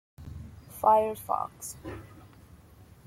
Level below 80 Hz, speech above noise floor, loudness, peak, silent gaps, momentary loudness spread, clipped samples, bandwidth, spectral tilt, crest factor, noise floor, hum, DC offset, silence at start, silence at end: -56 dBFS; 26 dB; -28 LUFS; -10 dBFS; none; 22 LU; under 0.1%; 16.5 kHz; -5 dB/octave; 22 dB; -54 dBFS; none; under 0.1%; 0.2 s; 0.8 s